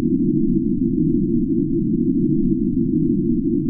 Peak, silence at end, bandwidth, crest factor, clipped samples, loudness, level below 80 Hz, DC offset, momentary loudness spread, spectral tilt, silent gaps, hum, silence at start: -6 dBFS; 0 s; 0.4 kHz; 12 dB; under 0.1%; -19 LUFS; -34 dBFS; under 0.1%; 1 LU; -18 dB/octave; none; none; 0 s